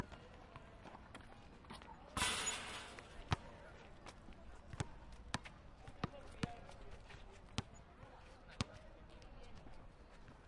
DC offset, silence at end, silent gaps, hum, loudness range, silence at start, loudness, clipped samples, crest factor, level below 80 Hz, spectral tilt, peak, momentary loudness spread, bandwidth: under 0.1%; 0 s; none; none; 8 LU; 0 s; -47 LUFS; under 0.1%; 32 dB; -60 dBFS; -3 dB/octave; -16 dBFS; 18 LU; 12 kHz